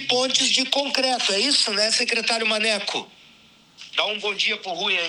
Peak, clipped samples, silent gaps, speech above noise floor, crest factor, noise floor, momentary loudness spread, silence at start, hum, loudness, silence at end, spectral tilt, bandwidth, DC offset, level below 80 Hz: -4 dBFS; under 0.1%; none; 31 dB; 18 dB; -53 dBFS; 6 LU; 0 s; none; -20 LUFS; 0 s; -0.5 dB/octave; 19 kHz; under 0.1%; -74 dBFS